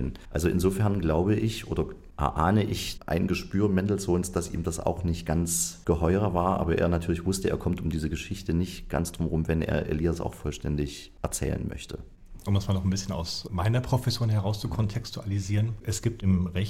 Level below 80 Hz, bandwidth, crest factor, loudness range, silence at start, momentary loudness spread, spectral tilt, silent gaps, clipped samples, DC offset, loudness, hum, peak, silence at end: -42 dBFS; 16 kHz; 18 dB; 4 LU; 0 s; 7 LU; -6 dB/octave; none; under 0.1%; under 0.1%; -28 LUFS; none; -10 dBFS; 0 s